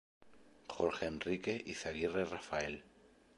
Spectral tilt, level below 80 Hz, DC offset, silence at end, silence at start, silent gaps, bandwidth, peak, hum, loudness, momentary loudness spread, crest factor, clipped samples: -4.5 dB/octave; -64 dBFS; under 0.1%; 0.3 s; 0.2 s; none; 11.5 kHz; -20 dBFS; none; -39 LUFS; 11 LU; 22 dB; under 0.1%